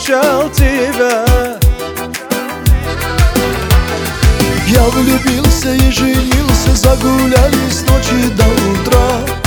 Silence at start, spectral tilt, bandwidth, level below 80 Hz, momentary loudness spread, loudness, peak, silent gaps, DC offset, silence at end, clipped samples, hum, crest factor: 0 s; -5 dB/octave; over 20 kHz; -16 dBFS; 5 LU; -12 LUFS; 0 dBFS; none; under 0.1%; 0 s; 0.2%; none; 10 dB